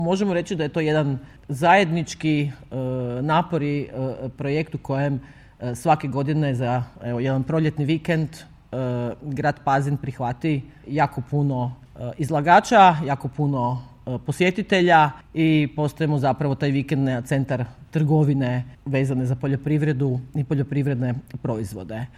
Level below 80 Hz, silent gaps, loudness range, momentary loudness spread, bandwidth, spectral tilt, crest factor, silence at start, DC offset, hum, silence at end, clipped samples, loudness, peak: -52 dBFS; none; 5 LU; 12 LU; 13.5 kHz; -7 dB/octave; 20 dB; 0 s; under 0.1%; none; 0.1 s; under 0.1%; -22 LUFS; -2 dBFS